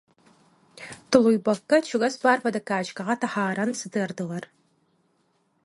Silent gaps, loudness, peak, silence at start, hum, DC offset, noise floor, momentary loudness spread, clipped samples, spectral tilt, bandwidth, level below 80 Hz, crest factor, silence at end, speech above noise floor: none; -24 LUFS; -2 dBFS; 0.8 s; none; under 0.1%; -69 dBFS; 14 LU; under 0.1%; -5 dB/octave; 11.5 kHz; -66 dBFS; 24 dB; 1.2 s; 45 dB